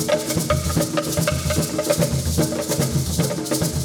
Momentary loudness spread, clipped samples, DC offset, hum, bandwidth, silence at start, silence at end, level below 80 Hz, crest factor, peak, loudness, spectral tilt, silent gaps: 2 LU; under 0.1%; under 0.1%; none; over 20 kHz; 0 s; 0 s; -34 dBFS; 16 dB; -4 dBFS; -21 LUFS; -4.5 dB/octave; none